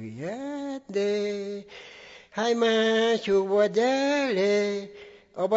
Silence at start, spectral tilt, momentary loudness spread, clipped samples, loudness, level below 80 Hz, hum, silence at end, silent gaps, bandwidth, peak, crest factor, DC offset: 0 s; -4.5 dB/octave; 20 LU; under 0.1%; -25 LUFS; -68 dBFS; none; 0 s; none; 8 kHz; -12 dBFS; 14 dB; under 0.1%